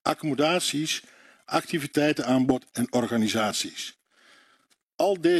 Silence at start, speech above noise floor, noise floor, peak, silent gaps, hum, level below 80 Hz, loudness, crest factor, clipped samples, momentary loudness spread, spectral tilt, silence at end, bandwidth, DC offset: 0.05 s; 41 dB; -66 dBFS; -10 dBFS; 4.83-4.90 s; none; -66 dBFS; -26 LUFS; 16 dB; under 0.1%; 6 LU; -4 dB/octave; 0 s; 14 kHz; under 0.1%